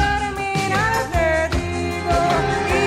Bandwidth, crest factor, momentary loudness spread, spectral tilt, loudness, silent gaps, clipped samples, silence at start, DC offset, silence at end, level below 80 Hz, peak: 16 kHz; 14 dB; 4 LU; -5 dB/octave; -20 LUFS; none; under 0.1%; 0 s; under 0.1%; 0 s; -30 dBFS; -6 dBFS